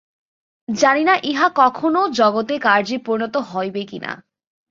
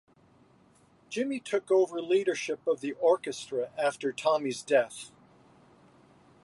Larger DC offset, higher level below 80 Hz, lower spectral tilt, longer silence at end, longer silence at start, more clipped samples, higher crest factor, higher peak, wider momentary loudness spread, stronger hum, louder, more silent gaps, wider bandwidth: neither; first, -66 dBFS vs -78 dBFS; about the same, -4 dB/octave vs -4 dB/octave; second, 0.55 s vs 1.35 s; second, 0.7 s vs 1.1 s; neither; about the same, 18 dB vs 20 dB; first, 0 dBFS vs -12 dBFS; first, 14 LU vs 8 LU; neither; first, -18 LUFS vs -29 LUFS; neither; second, 7.6 kHz vs 11.5 kHz